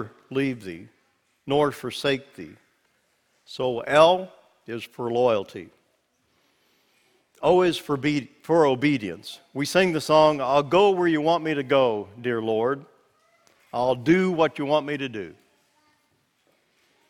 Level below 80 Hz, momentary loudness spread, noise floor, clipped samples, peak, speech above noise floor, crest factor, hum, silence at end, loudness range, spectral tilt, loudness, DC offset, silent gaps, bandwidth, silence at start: -62 dBFS; 18 LU; -69 dBFS; under 0.1%; -4 dBFS; 46 dB; 22 dB; none; 1.8 s; 8 LU; -5.5 dB/octave; -23 LUFS; under 0.1%; none; 18 kHz; 0 s